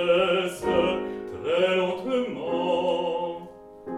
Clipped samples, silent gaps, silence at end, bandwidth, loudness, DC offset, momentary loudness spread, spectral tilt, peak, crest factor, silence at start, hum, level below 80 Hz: under 0.1%; none; 0 s; 13.5 kHz; -25 LUFS; under 0.1%; 11 LU; -5 dB/octave; -10 dBFS; 16 dB; 0 s; none; -56 dBFS